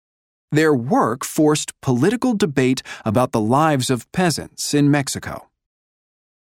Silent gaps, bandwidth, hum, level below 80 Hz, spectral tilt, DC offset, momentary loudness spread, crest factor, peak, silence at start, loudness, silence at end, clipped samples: none; 17 kHz; none; -54 dBFS; -5 dB/octave; under 0.1%; 7 LU; 16 dB; -2 dBFS; 0.5 s; -19 LUFS; 1.1 s; under 0.1%